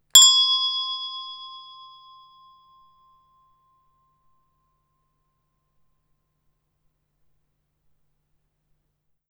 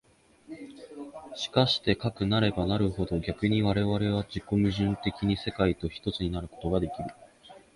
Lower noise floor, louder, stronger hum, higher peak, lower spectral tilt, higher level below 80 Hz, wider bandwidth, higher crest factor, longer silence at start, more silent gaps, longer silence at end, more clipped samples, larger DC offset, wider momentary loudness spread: first, -74 dBFS vs -53 dBFS; first, -16 LUFS vs -28 LUFS; neither; first, 0 dBFS vs -8 dBFS; second, 5.5 dB/octave vs -7 dB/octave; second, -76 dBFS vs -46 dBFS; first, over 20 kHz vs 11.5 kHz; first, 28 dB vs 20 dB; second, 0.15 s vs 0.5 s; neither; first, 7.7 s vs 0.15 s; neither; neither; first, 28 LU vs 17 LU